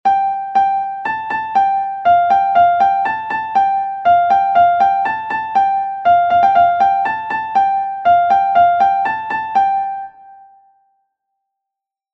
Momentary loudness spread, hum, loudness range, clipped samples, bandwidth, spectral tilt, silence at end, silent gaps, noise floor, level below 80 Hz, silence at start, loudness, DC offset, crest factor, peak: 8 LU; none; 3 LU; under 0.1%; 6 kHz; -5 dB/octave; 1.8 s; none; -84 dBFS; -56 dBFS; 0.05 s; -14 LUFS; under 0.1%; 12 dB; -2 dBFS